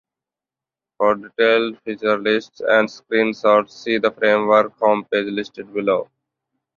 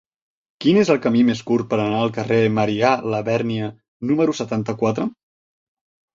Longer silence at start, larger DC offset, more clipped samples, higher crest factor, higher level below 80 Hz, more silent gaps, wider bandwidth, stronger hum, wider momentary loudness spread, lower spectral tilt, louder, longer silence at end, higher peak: first, 1 s vs 0.6 s; neither; neither; about the same, 18 dB vs 18 dB; second, -64 dBFS vs -58 dBFS; second, none vs 3.88-4.00 s; about the same, 7 kHz vs 7.6 kHz; neither; about the same, 8 LU vs 9 LU; about the same, -5.5 dB/octave vs -6.5 dB/octave; about the same, -19 LUFS vs -20 LUFS; second, 0.75 s vs 1.05 s; about the same, -2 dBFS vs -2 dBFS